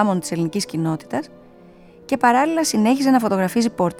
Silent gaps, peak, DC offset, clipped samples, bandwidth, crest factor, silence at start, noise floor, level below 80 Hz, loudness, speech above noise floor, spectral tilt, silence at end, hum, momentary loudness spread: none; -2 dBFS; under 0.1%; under 0.1%; 16.5 kHz; 18 dB; 0 s; -46 dBFS; -58 dBFS; -19 LUFS; 27 dB; -5 dB/octave; 0 s; none; 10 LU